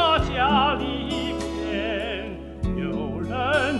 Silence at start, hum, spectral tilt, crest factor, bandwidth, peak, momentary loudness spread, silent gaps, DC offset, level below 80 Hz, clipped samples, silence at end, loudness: 0 s; none; -5.5 dB/octave; 16 dB; 11.5 kHz; -8 dBFS; 10 LU; none; under 0.1%; -36 dBFS; under 0.1%; 0 s; -25 LUFS